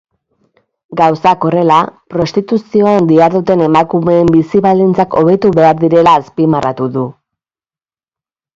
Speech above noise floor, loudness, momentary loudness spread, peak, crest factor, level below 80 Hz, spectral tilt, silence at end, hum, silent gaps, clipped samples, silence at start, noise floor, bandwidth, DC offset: over 80 dB; -10 LUFS; 8 LU; 0 dBFS; 12 dB; -46 dBFS; -8 dB/octave; 1.45 s; none; none; under 0.1%; 0.9 s; under -90 dBFS; 7.6 kHz; under 0.1%